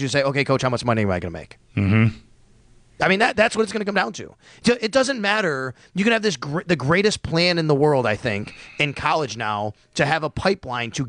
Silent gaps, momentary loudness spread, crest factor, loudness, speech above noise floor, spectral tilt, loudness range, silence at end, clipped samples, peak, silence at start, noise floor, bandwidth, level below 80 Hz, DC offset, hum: none; 9 LU; 16 dB; -21 LUFS; 31 dB; -5 dB/octave; 2 LU; 0 s; under 0.1%; -4 dBFS; 0 s; -52 dBFS; 10.5 kHz; -50 dBFS; under 0.1%; none